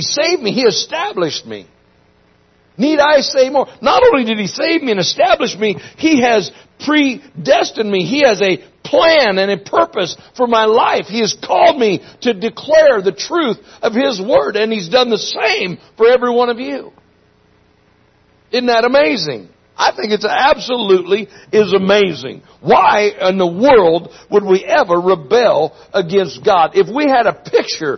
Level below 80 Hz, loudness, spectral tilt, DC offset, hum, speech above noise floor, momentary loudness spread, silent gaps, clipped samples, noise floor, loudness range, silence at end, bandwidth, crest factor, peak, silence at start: -52 dBFS; -13 LUFS; -4 dB/octave; under 0.1%; none; 39 dB; 9 LU; none; under 0.1%; -53 dBFS; 4 LU; 0 s; 6.4 kHz; 14 dB; 0 dBFS; 0 s